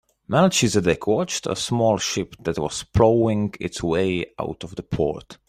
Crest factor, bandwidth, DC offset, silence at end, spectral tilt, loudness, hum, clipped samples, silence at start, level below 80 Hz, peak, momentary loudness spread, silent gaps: 18 dB; 15 kHz; under 0.1%; 0.15 s; -5 dB/octave; -22 LUFS; none; under 0.1%; 0.3 s; -46 dBFS; -2 dBFS; 10 LU; none